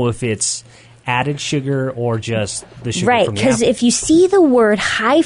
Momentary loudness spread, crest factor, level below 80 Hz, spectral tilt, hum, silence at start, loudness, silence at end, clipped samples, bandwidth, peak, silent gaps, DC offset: 10 LU; 12 dB; -46 dBFS; -4.5 dB/octave; none; 0 s; -16 LUFS; 0 s; under 0.1%; 11 kHz; -4 dBFS; none; under 0.1%